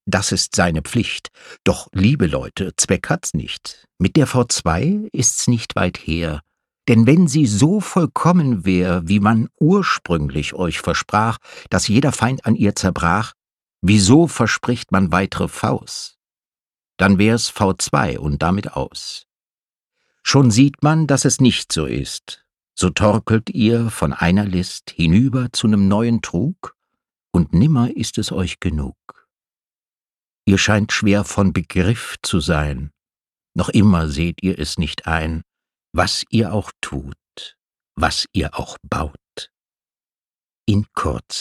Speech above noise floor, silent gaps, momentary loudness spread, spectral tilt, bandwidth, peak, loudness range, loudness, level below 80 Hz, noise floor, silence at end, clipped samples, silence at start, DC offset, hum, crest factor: over 73 dB; 16.62-16.66 s, 19.54-19.58 s, 30.35-30.39 s, 40.30-40.34 s, 40.57-40.61 s; 14 LU; -5 dB/octave; 13.5 kHz; 0 dBFS; 5 LU; -18 LUFS; -36 dBFS; under -90 dBFS; 0 s; under 0.1%; 0.05 s; under 0.1%; none; 18 dB